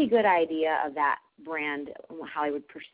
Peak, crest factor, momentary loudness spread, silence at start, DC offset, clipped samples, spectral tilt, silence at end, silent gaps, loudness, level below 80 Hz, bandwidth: -12 dBFS; 16 dB; 14 LU; 0 s; under 0.1%; under 0.1%; -8 dB/octave; 0.05 s; none; -28 LUFS; -72 dBFS; 4 kHz